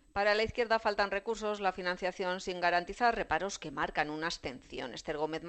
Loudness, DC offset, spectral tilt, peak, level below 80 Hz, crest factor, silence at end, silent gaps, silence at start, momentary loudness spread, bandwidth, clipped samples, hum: -33 LUFS; under 0.1%; -3.5 dB/octave; -14 dBFS; -56 dBFS; 18 dB; 0 s; none; 0.15 s; 9 LU; 8.8 kHz; under 0.1%; none